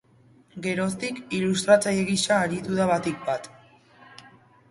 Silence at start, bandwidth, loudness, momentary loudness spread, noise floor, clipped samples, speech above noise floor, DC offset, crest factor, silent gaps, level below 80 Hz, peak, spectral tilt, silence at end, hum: 0.55 s; 11.5 kHz; -24 LUFS; 12 LU; -57 dBFS; under 0.1%; 33 dB; under 0.1%; 22 dB; none; -60 dBFS; -4 dBFS; -4.5 dB/octave; 0.45 s; none